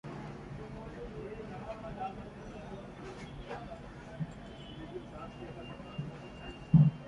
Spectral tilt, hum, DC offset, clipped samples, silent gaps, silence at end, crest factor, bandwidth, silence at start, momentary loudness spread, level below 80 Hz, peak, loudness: -8.5 dB/octave; none; under 0.1%; under 0.1%; none; 0 s; 24 dB; 7.6 kHz; 0.05 s; 6 LU; -54 dBFS; -12 dBFS; -39 LUFS